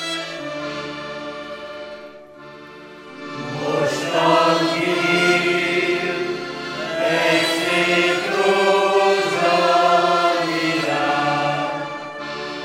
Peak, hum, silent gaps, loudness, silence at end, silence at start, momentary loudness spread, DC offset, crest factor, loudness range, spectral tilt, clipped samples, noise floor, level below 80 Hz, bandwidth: -4 dBFS; none; none; -19 LUFS; 0 s; 0 s; 17 LU; under 0.1%; 16 dB; 11 LU; -4 dB/octave; under 0.1%; -40 dBFS; -62 dBFS; 16 kHz